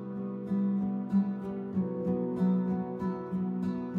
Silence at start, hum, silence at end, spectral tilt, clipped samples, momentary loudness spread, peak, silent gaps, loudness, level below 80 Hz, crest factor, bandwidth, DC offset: 0 s; none; 0 s; -11 dB/octave; under 0.1%; 6 LU; -18 dBFS; none; -32 LUFS; -66 dBFS; 12 dB; 4.2 kHz; under 0.1%